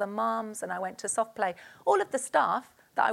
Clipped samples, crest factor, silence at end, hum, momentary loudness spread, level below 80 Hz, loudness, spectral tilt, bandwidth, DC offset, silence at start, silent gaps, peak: under 0.1%; 20 dB; 0 s; none; 8 LU; -78 dBFS; -30 LUFS; -3 dB/octave; 16.5 kHz; under 0.1%; 0 s; none; -10 dBFS